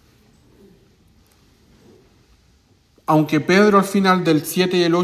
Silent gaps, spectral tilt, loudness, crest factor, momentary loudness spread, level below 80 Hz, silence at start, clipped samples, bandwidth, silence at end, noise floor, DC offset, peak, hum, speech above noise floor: none; -5.5 dB/octave; -16 LUFS; 18 dB; 6 LU; -58 dBFS; 3.1 s; under 0.1%; 16 kHz; 0 s; -56 dBFS; under 0.1%; -2 dBFS; none; 41 dB